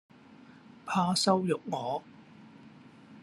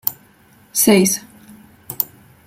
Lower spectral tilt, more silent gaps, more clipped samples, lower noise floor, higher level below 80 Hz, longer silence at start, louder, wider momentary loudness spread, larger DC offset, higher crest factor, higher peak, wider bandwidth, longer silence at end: about the same, -4.5 dB/octave vs -3.5 dB/octave; neither; neither; about the same, -54 dBFS vs -51 dBFS; second, -76 dBFS vs -58 dBFS; first, 0.3 s vs 0.05 s; second, -30 LUFS vs -17 LUFS; about the same, 12 LU vs 12 LU; neither; about the same, 22 dB vs 20 dB; second, -12 dBFS vs 0 dBFS; second, 13 kHz vs 16.5 kHz; second, 0 s vs 0.4 s